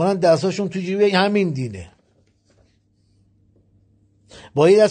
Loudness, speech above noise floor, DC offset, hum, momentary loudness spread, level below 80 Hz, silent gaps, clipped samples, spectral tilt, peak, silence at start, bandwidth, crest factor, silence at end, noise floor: -18 LUFS; 44 dB; under 0.1%; none; 13 LU; -60 dBFS; none; under 0.1%; -6 dB/octave; -4 dBFS; 0 s; 9.4 kHz; 16 dB; 0 s; -61 dBFS